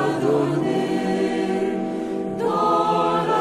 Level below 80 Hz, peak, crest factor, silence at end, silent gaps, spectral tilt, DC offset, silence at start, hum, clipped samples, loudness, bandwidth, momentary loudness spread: -58 dBFS; -8 dBFS; 14 dB; 0 s; none; -6.5 dB/octave; under 0.1%; 0 s; none; under 0.1%; -22 LUFS; 14 kHz; 7 LU